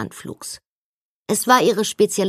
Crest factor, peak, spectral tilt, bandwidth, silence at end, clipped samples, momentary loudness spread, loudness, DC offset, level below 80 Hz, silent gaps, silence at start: 18 dB; -2 dBFS; -3.5 dB/octave; 15.5 kHz; 0 s; under 0.1%; 20 LU; -17 LUFS; under 0.1%; -64 dBFS; 0.66-1.26 s; 0 s